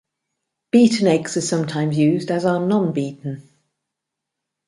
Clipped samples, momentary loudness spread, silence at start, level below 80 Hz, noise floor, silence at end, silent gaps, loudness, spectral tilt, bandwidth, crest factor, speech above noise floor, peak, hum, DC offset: under 0.1%; 13 LU; 0.75 s; -64 dBFS; -82 dBFS; 1.25 s; none; -19 LUFS; -6 dB/octave; 11.5 kHz; 18 dB; 64 dB; -2 dBFS; none; under 0.1%